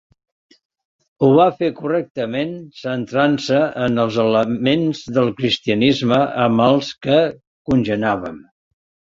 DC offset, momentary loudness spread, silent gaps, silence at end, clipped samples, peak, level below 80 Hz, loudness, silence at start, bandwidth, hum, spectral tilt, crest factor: under 0.1%; 9 LU; 2.10-2.15 s, 7.47-7.65 s; 0.7 s; under 0.1%; -2 dBFS; -52 dBFS; -18 LUFS; 1.2 s; 7.6 kHz; none; -6.5 dB/octave; 16 dB